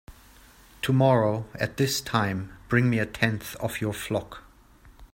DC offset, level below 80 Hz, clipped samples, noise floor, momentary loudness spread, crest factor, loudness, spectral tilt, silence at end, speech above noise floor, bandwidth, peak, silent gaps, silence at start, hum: under 0.1%; -52 dBFS; under 0.1%; -53 dBFS; 11 LU; 22 dB; -26 LUFS; -5.5 dB/octave; 0.1 s; 28 dB; 16.5 kHz; -6 dBFS; none; 0.1 s; none